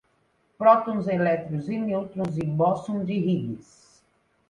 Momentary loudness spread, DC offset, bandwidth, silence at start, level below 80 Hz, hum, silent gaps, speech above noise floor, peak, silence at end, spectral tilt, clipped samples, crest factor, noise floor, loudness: 10 LU; under 0.1%; 10 kHz; 0.6 s; -62 dBFS; none; none; 43 dB; -4 dBFS; 0.85 s; -8.5 dB/octave; under 0.1%; 22 dB; -67 dBFS; -25 LUFS